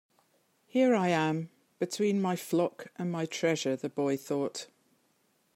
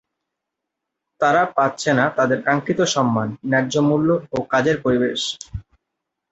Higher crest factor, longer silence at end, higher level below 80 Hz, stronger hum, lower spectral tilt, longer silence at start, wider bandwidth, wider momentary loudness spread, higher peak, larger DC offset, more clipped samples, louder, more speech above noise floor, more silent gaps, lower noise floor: about the same, 16 dB vs 18 dB; first, 0.9 s vs 0.7 s; second, -80 dBFS vs -50 dBFS; neither; about the same, -5.5 dB/octave vs -5 dB/octave; second, 0.75 s vs 1.2 s; first, 16 kHz vs 8.2 kHz; first, 11 LU vs 6 LU; second, -14 dBFS vs -4 dBFS; neither; neither; second, -31 LUFS vs -19 LUFS; second, 42 dB vs 63 dB; neither; second, -72 dBFS vs -82 dBFS